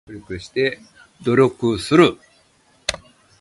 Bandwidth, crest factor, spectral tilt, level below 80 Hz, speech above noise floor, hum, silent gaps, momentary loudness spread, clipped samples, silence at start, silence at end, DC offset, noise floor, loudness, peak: 11.5 kHz; 20 dB; -5.5 dB/octave; -50 dBFS; 39 dB; none; none; 18 LU; under 0.1%; 0.1 s; 0.45 s; under 0.1%; -57 dBFS; -19 LUFS; 0 dBFS